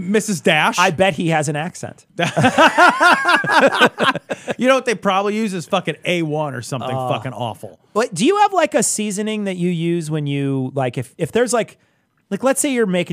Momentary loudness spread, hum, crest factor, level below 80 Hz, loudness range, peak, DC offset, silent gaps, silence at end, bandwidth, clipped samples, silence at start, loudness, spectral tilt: 13 LU; none; 18 dB; -62 dBFS; 7 LU; 0 dBFS; under 0.1%; none; 0 s; 15.5 kHz; under 0.1%; 0 s; -17 LUFS; -4 dB/octave